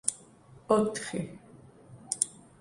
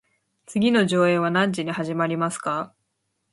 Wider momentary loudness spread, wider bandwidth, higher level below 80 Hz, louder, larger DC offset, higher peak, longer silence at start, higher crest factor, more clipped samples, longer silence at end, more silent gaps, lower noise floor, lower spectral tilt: first, 19 LU vs 10 LU; about the same, 11.5 kHz vs 11.5 kHz; about the same, -66 dBFS vs -68 dBFS; second, -31 LUFS vs -22 LUFS; neither; about the same, -6 dBFS vs -6 dBFS; second, 0.05 s vs 0.5 s; first, 28 dB vs 18 dB; neither; second, 0.3 s vs 0.65 s; neither; second, -55 dBFS vs -75 dBFS; second, -4 dB/octave vs -5.5 dB/octave